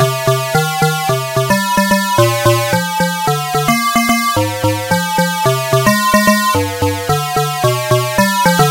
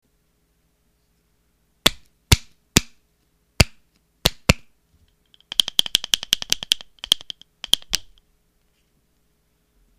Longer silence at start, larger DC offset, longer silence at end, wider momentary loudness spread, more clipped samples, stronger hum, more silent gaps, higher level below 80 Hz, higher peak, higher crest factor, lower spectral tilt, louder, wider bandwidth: second, 0 s vs 1.85 s; neither; second, 0 s vs 2 s; about the same, 5 LU vs 4 LU; neither; neither; neither; second, -42 dBFS vs -36 dBFS; about the same, 0 dBFS vs 0 dBFS; second, 12 dB vs 26 dB; first, -4.5 dB/octave vs -2.5 dB/octave; first, -13 LUFS vs -21 LUFS; about the same, 16 kHz vs 15.5 kHz